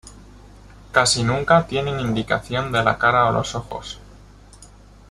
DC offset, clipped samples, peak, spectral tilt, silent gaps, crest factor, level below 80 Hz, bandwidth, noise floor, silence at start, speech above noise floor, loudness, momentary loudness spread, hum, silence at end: under 0.1%; under 0.1%; -2 dBFS; -4 dB/octave; none; 20 dB; -44 dBFS; 13 kHz; -45 dBFS; 0.05 s; 26 dB; -19 LUFS; 15 LU; 50 Hz at -40 dBFS; 0.45 s